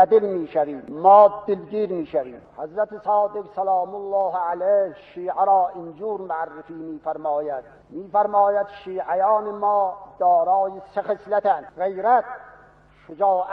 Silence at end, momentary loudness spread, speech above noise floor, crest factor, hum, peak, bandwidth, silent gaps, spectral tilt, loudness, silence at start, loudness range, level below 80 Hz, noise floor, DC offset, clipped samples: 0 s; 14 LU; 30 dB; 18 dB; none; -2 dBFS; 4.8 kHz; none; -9 dB/octave; -22 LUFS; 0 s; 5 LU; -64 dBFS; -52 dBFS; under 0.1%; under 0.1%